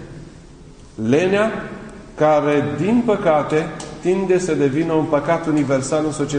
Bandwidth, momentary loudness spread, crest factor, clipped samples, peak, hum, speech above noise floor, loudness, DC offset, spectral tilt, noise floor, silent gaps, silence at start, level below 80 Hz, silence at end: 10 kHz; 15 LU; 16 dB; under 0.1%; -4 dBFS; none; 24 dB; -18 LUFS; under 0.1%; -6 dB/octave; -41 dBFS; none; 0 s; -46 dBFS; 0 s